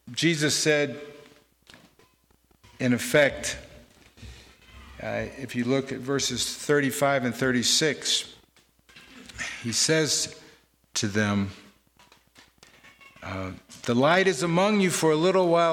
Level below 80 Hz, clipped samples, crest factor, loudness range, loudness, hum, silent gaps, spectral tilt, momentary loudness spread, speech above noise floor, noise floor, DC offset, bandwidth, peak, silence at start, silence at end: -58 dBFS; under 0.1%; 18 dB; 6 LU; -24 LUFS; none; none; -3.5 dB/octave; 14 LU; 39 dB; -64 dBFS; under 0.1%; 18 kHz; -8 dBFS; 0.05 s; 0 s